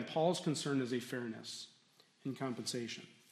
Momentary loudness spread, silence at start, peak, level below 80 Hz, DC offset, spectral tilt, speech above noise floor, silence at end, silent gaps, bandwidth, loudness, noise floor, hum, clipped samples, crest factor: 13 LU; 0 s; -20 dBFS; -86 dBFS; under 0.1%; -4.5 dB/octave; 30 dB; 0.2 s; none; 14 kHz; -39 LUFS; -69 dBFS; none; under 0.1%; 20 dB